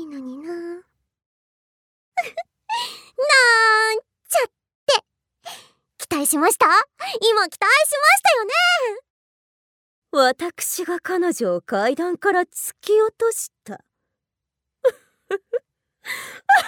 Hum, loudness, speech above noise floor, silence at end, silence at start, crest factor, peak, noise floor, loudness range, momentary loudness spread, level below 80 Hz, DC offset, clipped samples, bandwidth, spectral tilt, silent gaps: none; -19 LUFS; 65 dB; 0 s; 0 s; 18 dB; -4 dBFS; -84 dBFS; 8 LU; 18 LU; -74 dBFS; under 0.1%; under 0.1%; 19.5 kHz; -1 dB/octave; 1.26-2.12 s, 4.75-4.87 s, 9.10-10.02 s